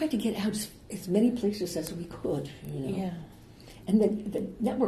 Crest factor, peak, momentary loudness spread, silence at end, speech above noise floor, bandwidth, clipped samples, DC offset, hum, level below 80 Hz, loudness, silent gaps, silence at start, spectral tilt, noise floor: 18 dB; -12 dBFS; 14 LU; 0 s; 20 dB; 13 kHz; under 0.1%; under 0.1%; none; -56 dBFS; -30 LUFS; none; 0 s; -6 dB/octave; -50 dBFS